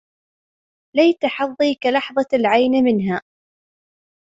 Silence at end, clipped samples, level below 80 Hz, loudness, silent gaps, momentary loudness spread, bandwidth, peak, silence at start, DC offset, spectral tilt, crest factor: 1.05 s; under 0.1%; -64 dBFS; -18 LUFS; none; 7 LU; 7.8 kHz; -2 dBFS; 0.95 s; under 0.1%; -6.5 dB/octave; 16 dB